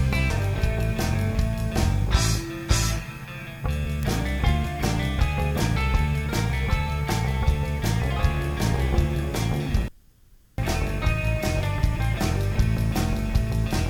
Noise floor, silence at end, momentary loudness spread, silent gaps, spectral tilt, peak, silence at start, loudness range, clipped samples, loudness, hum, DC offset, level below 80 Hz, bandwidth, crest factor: -54 dBFS; 0 s; 4 LU; none; -5.5 dB/octave; -6 dBFS; 0 s; 2 LU; under 0.1%; -25 LUFS; none; under 0.1%; -28 dBFS; 19 kHz; 16 dB